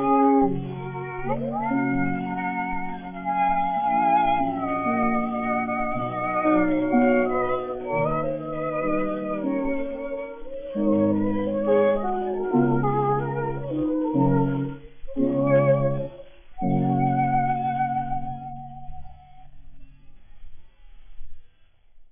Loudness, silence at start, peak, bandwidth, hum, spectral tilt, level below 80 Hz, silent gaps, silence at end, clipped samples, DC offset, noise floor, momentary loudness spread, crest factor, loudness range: -24 LUFS; 0 s; -8 dBFS; 3.6 kHz; none; -7.5 dB/octave; -44 dBFS; none; 0.1 s; under 0.1%; under 0.1%; -52 dBFS; 12 LU; 16 dB; 4 LU